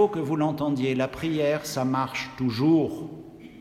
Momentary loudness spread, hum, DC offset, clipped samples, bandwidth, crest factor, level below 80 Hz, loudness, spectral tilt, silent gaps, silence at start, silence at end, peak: 14 LU; none; under 0.1%; under 0.1%; 15.5 kHz; 16 dB; -58 dBFS; -26 LUFS; -6.5 dB/octave; none; 0 s; 0 s; -10 dBFS